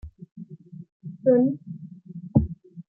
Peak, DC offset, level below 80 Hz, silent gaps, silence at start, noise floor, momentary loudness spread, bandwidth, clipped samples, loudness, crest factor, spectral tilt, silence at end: -6 dBFS; under 0.1%; -44 dBFS; 0.31-0.36 s, 0.92-1.00 s; 0.05 s; -42 dBFS; 24 LU; 1.9 kHz; under 0.1%; -24 LUFS; 20 dB; -14.5 dB/octave; 0.1 s